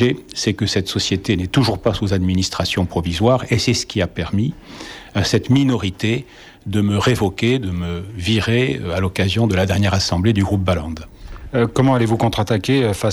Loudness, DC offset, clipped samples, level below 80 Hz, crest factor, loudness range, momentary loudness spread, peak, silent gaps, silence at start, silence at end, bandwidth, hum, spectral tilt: -18 LUFS; under 0.1%; under 0.1%; -38 dBFS; 14 dB; 1 LU; 8 LU; -4 dBFS; none; 0 s; 0 s; 14.5 kHz; none; -5.5 dB/octave